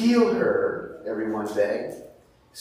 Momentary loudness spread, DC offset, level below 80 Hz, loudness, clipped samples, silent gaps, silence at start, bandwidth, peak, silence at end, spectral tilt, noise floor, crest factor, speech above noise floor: 16 LU; under 0.1%; -62 dBFS; -25 LUFS; under 0.1%; none; 0 s; 15 kHz; -8 dBFS; 0 s; -6 dB/octave; -52 dBFS; 16 dB; 28 dB